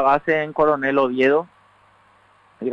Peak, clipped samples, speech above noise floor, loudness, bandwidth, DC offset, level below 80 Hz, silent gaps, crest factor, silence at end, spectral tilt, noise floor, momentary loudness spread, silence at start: -4 dBFS; under 0.1%; 37 dB; -19 LUFS; 7.2 kHz; under 0.1%; -58 dBFS; none; 16 dB; 0 s; -7 dB/octave; -55 dBFS; 9 LU; 0 s